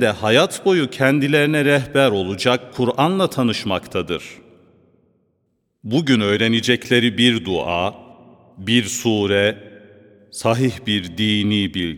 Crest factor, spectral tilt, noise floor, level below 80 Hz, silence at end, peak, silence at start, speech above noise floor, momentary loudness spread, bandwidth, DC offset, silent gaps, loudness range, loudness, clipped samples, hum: 18 dB; -5 dB/octave; -69 dBFS; -54 dBFS; 0 s; 0 dBFS; 0 s; 51 dB; 8 LU; 17.5 kHz; under 0.1%; none; 5 LU; -18 LUFS; under 0.1%; none